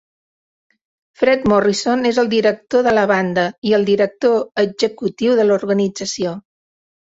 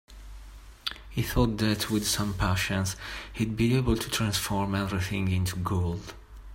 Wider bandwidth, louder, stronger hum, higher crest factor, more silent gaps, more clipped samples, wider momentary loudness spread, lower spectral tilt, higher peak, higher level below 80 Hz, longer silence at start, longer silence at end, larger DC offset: second, 8 kHz vs 16.5 kHz; first, -16 LUFS vs -28 LUFS; neither; about the same, 16 dB vs 20 dB; first, 3.58-3.62 s vs none; neither; second, 6 LU vs 13 LU; about the same, -5 dB/octave vs -5 dB/octave; first, -2 dBFS vs -10 dBFS; second, -54 dBFS vs -42 dBFS; first, 1.2 s vs 0.1 s; first, 0.65 s vs 0 s; neither